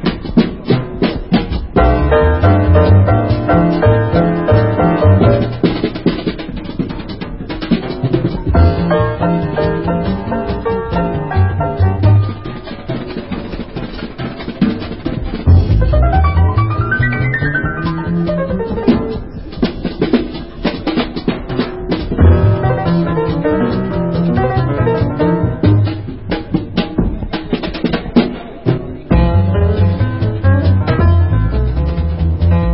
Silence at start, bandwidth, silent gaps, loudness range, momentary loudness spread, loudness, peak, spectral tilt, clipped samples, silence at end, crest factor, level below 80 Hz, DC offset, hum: 0 s; 5.8 kHz; none; 6 LU; 11 LU; -15 LUFS; 0 dBFS; -12.5 dB/octave; under 0.1%; 0 s; 14 dB; -20 dBFS; 0.9%; none